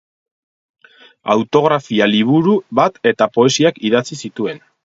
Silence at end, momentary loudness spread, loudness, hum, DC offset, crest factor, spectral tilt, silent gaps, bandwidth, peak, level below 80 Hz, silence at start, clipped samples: 0.25 s; 11 LU; -15 LUFS; none; under 0.1%; 16 dB; -5 dB/octave; none; 7.8 kHz; 0 dBFS; -60 dBFS; 1.25 s; under 0.1%